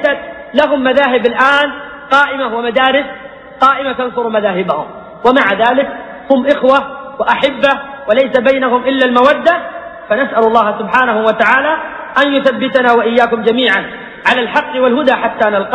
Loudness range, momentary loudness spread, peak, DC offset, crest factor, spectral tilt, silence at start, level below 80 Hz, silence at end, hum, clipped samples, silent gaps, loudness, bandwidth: 2 LU; 8 LU; 0 dBFS; under 0.1%; 12 dB; -5 dB/octave; 0 s; -50 dBFS; 0 s; none; under 0.1%; none; -12 LUFS; 9.6 kHz